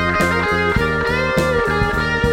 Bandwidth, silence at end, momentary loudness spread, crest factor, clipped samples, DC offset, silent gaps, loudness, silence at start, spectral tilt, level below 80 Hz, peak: 16.5 kHz; 0 s; 1 LU; 14 dB; under 0.1%; under 0.1%; none; -17 LUFS; 0 s; -5.5 dB/octave; -30 dBFS; -2 dBFS